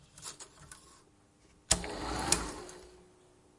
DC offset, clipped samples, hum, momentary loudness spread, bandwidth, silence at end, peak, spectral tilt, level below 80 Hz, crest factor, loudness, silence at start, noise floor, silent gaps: under 0.1%; under 0.1%; none; 22 LU; 11.5 kHz; 0.55 s; -6 dBFS; -2 dB/octave; -52 dBFS; 32 dB; -33 LUFS; 0 s; -64 dBFS; none